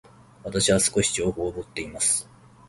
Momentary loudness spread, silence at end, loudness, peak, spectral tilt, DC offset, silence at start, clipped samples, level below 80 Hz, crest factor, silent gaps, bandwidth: 14 LU; 0.45 s; -24 LUFS; -8 dBFS; -3 dB/octave; under 0.1%; 0.45 s; under 0.1%; -48 dBFS; 18 dB; none; 12 kHz